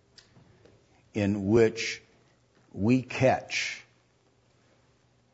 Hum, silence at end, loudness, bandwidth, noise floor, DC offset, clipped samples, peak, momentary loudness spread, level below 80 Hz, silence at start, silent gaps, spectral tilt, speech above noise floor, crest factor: none; 1.5 s; -27 LUFS; 8 kHz; -66 dBFS; under 0.1%; under 0.1%; -10 dBFS; 16 LU; -62 dBFS; 1.15 s; none; -5.5 dB/octave; 40 dB; 20 dB